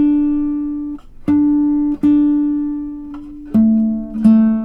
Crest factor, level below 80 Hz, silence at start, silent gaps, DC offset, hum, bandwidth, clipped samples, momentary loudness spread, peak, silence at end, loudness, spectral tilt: 14 dB; -38 dBFS; 0 s; none; under 0.1%; none; 3.4 kHz; under 0.1%; 14 LU; -2 dBFS; 0 s; -16 LUFS; -10 dB/octave